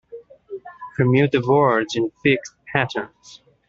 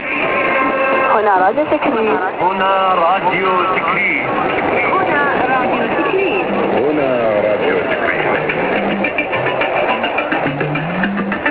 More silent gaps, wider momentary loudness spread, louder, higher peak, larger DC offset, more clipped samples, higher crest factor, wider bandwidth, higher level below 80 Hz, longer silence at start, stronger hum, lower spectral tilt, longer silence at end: neither; first, 20 LU vs 4 LU; second, -20 LUFS vs -15 LUFS; about the same, -2 dBFS vs 0 dBFS; neither; neither; about the same, 18 dB vs 14 dB; first, 7.6 kHz vs 4 kHz; second, -58 dBFS vs -48 dBFS; about the same, 0.1 s vs 0 s; neither; second, -6.5 dB/octave vs -9 dB/octave; first, 0.3 s vs 0 s